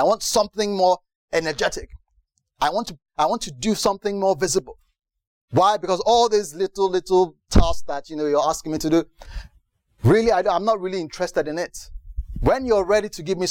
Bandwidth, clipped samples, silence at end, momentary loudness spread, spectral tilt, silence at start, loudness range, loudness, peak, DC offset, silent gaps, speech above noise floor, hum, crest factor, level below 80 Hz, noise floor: 17 kHz; under 0.1%; 0 s; 12 LU; -4.5 dB/octave; 0 s; 3 LU; -21 LUFS; -2 dBFS; under 0.1%; 1.15-1.28 s, 5.27-5.48 s; 46 dB; none; 20 dB; -34 dBFS; -66 dBFS